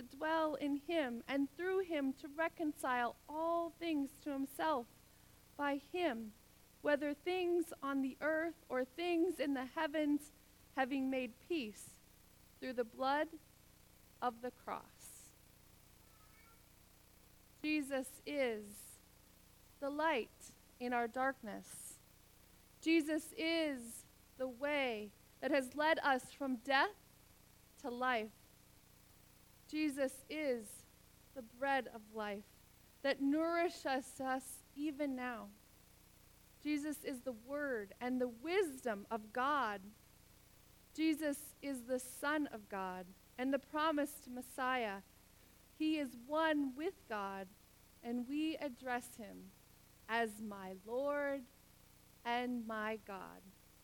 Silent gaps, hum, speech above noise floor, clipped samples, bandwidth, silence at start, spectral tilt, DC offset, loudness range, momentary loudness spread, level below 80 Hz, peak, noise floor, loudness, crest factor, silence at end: none; none; 26 dB; under 0.1%; 19 kHz; 0 s; -3.5 dB/octave; under 0.1%; 6 LU; 15 LU; -72 dBFS; -18 dBFS; -66 dBFS; -40 LUFS; 22 dB; 0.3 s